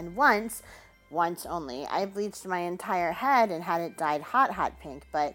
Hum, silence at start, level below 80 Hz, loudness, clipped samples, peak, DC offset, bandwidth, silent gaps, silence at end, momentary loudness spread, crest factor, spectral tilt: none; 0 s; -58 dBFS; -28 LUFS; under 0.1%; -8 dBFS; under 0.1%; 17 kHz; none; 0 s; 11 LU; 20 dB; -4.5 dB/octave